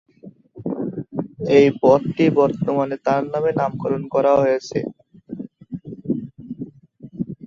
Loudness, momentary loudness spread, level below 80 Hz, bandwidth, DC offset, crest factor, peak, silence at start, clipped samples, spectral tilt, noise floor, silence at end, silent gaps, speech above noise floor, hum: -19 LUFS; 20 LU; -58 dBFS; 7.2 kHz; under 0.1%; 18 dB; -2 dBFS; 0.25 s; under 0.1%; -7.5 dB/octave; -45 dBFS; 0.15 s; none; 27 dB; none